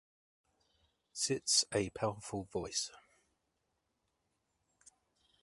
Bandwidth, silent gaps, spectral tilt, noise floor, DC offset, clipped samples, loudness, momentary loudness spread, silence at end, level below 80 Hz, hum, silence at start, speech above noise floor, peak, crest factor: 11.5 kHz; none; -2.5 dB/octave; -83 dBFS; under 0.1%; under 0.1%; -35 LUFS; 14 LU; 2.45 s; -68 dBFS; none; 1.15 s; 47 dB; -16 dBFS; 24 dB